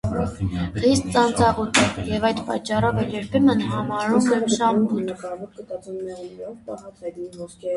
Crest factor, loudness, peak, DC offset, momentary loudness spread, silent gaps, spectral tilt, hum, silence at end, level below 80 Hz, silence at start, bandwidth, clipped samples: 20 dB; -21 LUFS; -2 dBFS; under 0.1%; 16 LU; none; -5 dB/octave; none; 0 s; -42 dBFS; 0.05 s; 11.5 kHz; under 0.1%